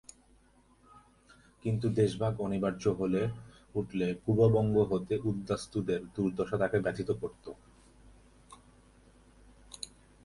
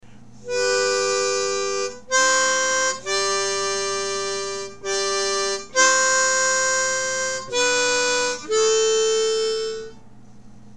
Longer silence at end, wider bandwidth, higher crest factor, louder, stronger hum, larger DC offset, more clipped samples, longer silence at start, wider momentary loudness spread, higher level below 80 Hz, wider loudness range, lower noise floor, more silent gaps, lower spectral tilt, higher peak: first, 0.4 s vs 0.15 s; second, 11.5 kHz vs 13 kHz; about the same, 20 dB vs 16 dB; second, -32 LUFS vs -20 LUFS; neither; second, under 0.1% vs 0.7%; neither; first, 1.65 s vs 0 s; first, 18 LU vs 9 LU; about the same, -58 dBFS vs -56 dBFS; first, 7 LU vs 2 LU; first, -64 dBFS vs -47 dBFS; neither; first, -7.5 dB/octave vs 0 dB/octave; second, -14 dBFS vs -6 dBFS